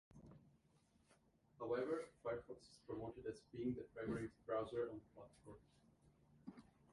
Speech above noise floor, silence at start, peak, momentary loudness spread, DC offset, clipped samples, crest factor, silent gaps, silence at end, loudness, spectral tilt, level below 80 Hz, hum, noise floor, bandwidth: 29 dB; 0.15 s; -30 dBFS; 20 LU; under 0.1%; under 0.1%; 20 dB; none; 0.3 s; -48 LUFS; -7 dB/octave; -74 dBFS; none; -77 dBFS; 11.5 kHz